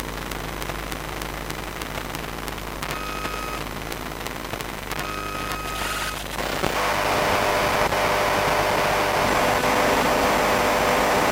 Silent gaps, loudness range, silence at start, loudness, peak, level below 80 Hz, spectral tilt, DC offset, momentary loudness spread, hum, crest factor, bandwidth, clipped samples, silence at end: none; 10 LU; 0 s; -23 LUFS; -2 dBFS; -38 dBFS; -3.5 dB/octave; under 0.1%; 11 LU; none; 22 dB; 17 kHz; under 0.1%; 0 s